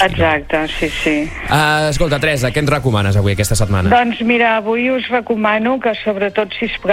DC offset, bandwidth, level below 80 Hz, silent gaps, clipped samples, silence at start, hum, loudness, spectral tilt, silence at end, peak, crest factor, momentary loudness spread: under 0.1%; 16.5 kHz; -30 dBFS; none; under 0.1%; 0 s; none; -15 LUFS; -5 dB/octave; 0 s; -2 dBFS; 14 dB; 5 LU